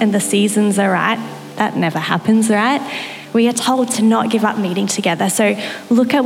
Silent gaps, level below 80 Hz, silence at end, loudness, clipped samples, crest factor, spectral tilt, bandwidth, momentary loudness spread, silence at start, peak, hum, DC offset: none; -72 dBFS; 0 s; -16 LUFS; under 0.1%; 14 dB; -4.5 dB/octave; 16 kHz; 6 LU; 0 s; -2 dBFS; none; under 0.1%